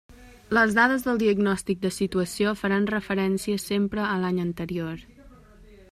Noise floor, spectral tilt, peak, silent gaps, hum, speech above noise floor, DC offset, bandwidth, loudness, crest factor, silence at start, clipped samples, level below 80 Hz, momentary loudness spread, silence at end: -50 dBFS; -5.5 dB/octave; -6 dBFS; none; none; 26 dB; under 0.1%; 15 kHz; -25 LUFS; 20 dB; 0.1 s; under 0.1%; -52 dBFS; 9 LU; 0.15 s